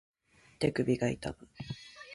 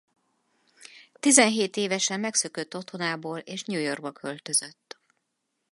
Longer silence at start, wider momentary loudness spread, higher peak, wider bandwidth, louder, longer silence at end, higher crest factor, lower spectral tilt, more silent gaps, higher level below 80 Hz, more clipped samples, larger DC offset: second, 0.6 s vs 0.95 s; about the same, 15 LU vs 17 LU; second, -16 dBFS vs -2 dBFS; about the same, 11.5 kHz vs 12 kHz; second, -34 LUFS vs -25 LUFS; second, 0 s vs 1 s; second, 20 dB vs 26 dB; first, -6.5 dB/octave vs -2 dB/octave; neither; first, -58 dBFS vs -82 dBFS; neither; neither